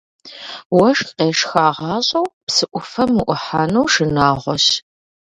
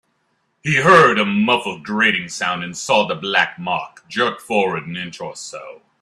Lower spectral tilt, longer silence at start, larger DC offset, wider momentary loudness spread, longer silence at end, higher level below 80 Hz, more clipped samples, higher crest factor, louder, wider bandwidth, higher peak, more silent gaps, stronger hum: about the same, -4 dB/octave vs -4 dB/octave; second, 0.25 s vs 0.65 s; neither; second, 7 LU vs 18 LU; first, 0.5 s vs 0.25 s; first, -48 dBFS vs -60 dBFS; neither; about the same, 18 dB vs 18 dB; about the same, -16 LUFS vs -17 LUFS; second, 11 kHz vs 13 kHz; about the same, 0 dBFS vs 0 dBFS; first, 0.65-0.70 s, 2.33-2.47 s vs none; neither